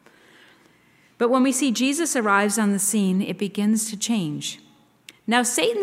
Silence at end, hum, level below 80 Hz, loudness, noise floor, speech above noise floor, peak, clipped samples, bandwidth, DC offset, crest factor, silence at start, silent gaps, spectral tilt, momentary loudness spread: 0 s; none; -76 dBFS; -22 LUFS; -57 dBFS; 36 dB; -4 dBFS; under 0.1%; 16 kHz; under 0.1%; 18 dB; 1.2 s; none; -3.5 dB/octave; 9 LU